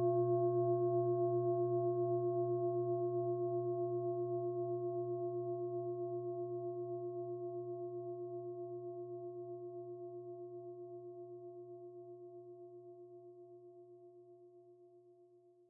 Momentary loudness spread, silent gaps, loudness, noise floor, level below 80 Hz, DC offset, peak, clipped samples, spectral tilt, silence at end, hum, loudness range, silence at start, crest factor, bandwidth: 21 LU; none; -39 LUFS; -66 dBFS; under -90 dBFS; under 0.1%; -26 dBFS; under 0.1%; -3.5 dB/octave; 0.45 s; none; 19 LU; 0 s; 14 dB; 1.6 kHz